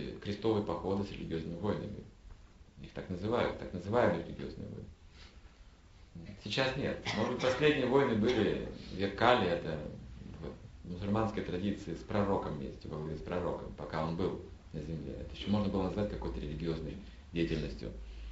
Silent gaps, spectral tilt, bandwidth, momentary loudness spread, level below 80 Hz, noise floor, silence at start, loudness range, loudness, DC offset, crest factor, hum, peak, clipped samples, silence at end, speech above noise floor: none; -5 dB/octave; 8 kHz; 17 LU; -50 dBFS; -57 dBFS; 0 s; 7 LU; -35 LUFS; under 0.1%; 24 dB; none; -12 dBFS; under 0.1%; 0 s; 23 dB